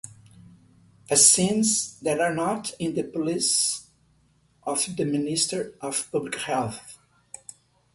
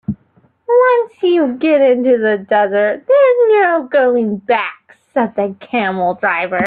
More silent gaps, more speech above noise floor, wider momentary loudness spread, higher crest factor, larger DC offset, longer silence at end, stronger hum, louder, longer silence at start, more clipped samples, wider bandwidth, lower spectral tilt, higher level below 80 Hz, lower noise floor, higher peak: neither; about the same, 39 dB vs 40 dB; first, 21 LU vs 8 LU; first, 24 dB vs 12 dB; neither; first, 1 s vs 0 s; neither; second, -23 LUFS vs -14 LUFS; about the same, 0.05 s vs 0.1 s; neither; first, 12 kHz vs 4.7 kHz; second, -2.5 dB/octave vs -8.5 dB/octave; second, -64 dBFS vs -58 dBFS; first, -63 dBFS vs -54 dBFS; about the same, -4 dBFS vs -2 dBFS